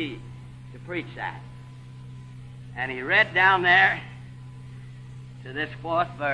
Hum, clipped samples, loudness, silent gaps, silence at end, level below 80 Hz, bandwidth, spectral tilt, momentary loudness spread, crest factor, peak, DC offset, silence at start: none; under 0.1%; -22 LUFS; none; 0 s; -54 dBFS; 10.5 kHz; -5.5 dB/octave; 25 LU; 20 dB; -6 dBFS; under 0.1%; 0 s